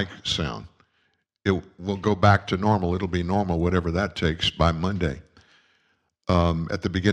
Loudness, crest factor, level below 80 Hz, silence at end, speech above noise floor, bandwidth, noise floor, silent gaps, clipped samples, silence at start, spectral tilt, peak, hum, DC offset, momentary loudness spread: -24 LUFS; 20 dB; -40 dBFS; 0 s; 47 dB; 9.4 kHz; -70 dBFS; none; under 0.1%; 0 s; -6 dB/octave; -4 dBFS; none; under 0.1%; 9 LU